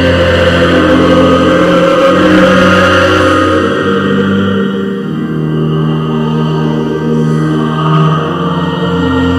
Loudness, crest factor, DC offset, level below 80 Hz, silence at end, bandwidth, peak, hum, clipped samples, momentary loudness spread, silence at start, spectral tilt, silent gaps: -9 LUFS; 8 dB; under 0.1%; -32 dBFS; 0 s; 12.5 kHz; 0 dBFS; none; 0.4%; 7 LU; 0 s; -6.5 dB/octave; none